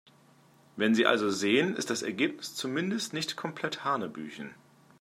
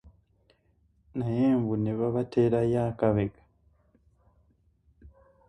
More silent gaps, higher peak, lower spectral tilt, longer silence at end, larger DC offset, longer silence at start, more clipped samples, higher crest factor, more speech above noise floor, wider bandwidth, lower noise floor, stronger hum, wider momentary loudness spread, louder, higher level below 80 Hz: neither; first, -8 dBFS vs -12 dBFS; second, -4 dB/octave vs -10 dB/octave; about the same, 0.45 s vs 0.4 s; neither; first, 0.75 s vs 0.05 s; neither; first, 24 dB vs 18 dB; second, 31 dB vs 41 dB; first, 15.5 kHz vs 10.5 kHz; second, -61 dBFS vs -67 dBFS; neither; first, 16 LU vs 9 LU; about the same, -29 LUFS vs -27 LUFS; second, -78 dBFS vs -54 dBFS